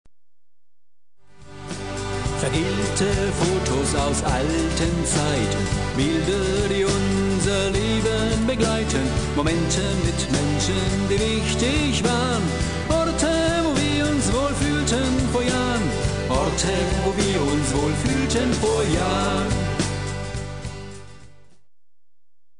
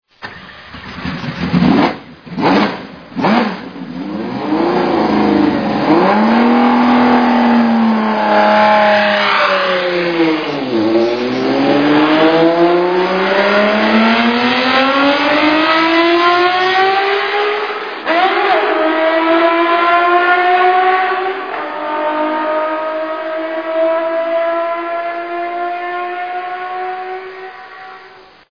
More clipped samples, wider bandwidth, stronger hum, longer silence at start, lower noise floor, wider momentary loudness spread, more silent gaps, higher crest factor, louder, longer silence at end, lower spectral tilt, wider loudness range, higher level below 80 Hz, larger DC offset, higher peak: neither; first, 10.5 kHz vs 5.4 kHz; neither; first, 1.4 s vs 0.2 s; first, -87 dBFS vs -40 dBFS; second, 5 LU vs 12 LU; neither; about the same, 14 dB vs 14 dB; second, -22 LUFS vs -13 LUFS; first, 1.35 s vs 0.4 s; second, -4.5 dB/octave vs -6.5 dB/octave; second, 3 LU vs 7 LU; first, -32 dBFS vs -50 dBFS; first, 0.8% vs 0.2%; second, -8 dBFS vs 0 dBFS